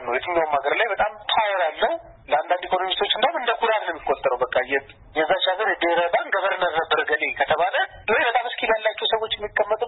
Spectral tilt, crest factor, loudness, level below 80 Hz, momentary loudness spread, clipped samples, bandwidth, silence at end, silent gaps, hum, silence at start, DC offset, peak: -7.5 dB/octave; 14 dB; -22 LUFS; -54 dBFS; 4 LU; under 0.1%; 4.1 kHz; 0 s; none; none; 0 s; under 0.1%; -8 dBFS